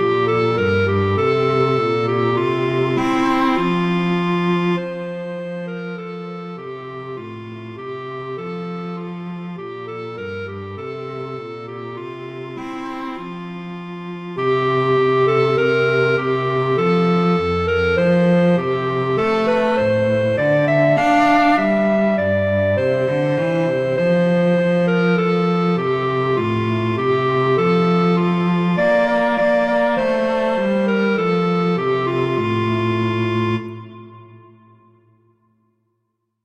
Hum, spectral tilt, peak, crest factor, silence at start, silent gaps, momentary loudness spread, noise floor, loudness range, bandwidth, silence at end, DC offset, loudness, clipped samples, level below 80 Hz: none; -8 dB/octave; -2 dBFS; 16 dB; 0 s; none; 14 LU; -72 dBFS; 13 LU; 8.4 kHz; 2.05 s; under 0.1%; -18 LUFS; under 0.1%; -52 dBFS